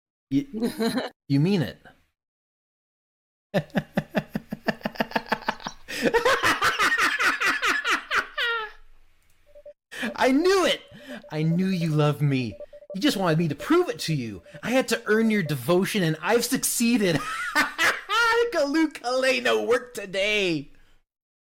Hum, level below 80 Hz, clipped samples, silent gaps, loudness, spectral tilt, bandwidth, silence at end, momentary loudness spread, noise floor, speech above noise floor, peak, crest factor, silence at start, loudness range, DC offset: none; -54 dBFS; under 0.1%; 1.16-1.20 s, 2.28-3.50 s; -24 LUFS; -4.5 dB/octave; 17 kHz; 0.75 s; 11 LU; -56 dBFS; 33 dB; -6 dBFS; 18 dB; 0.3 s; 7 LU; under 0.1%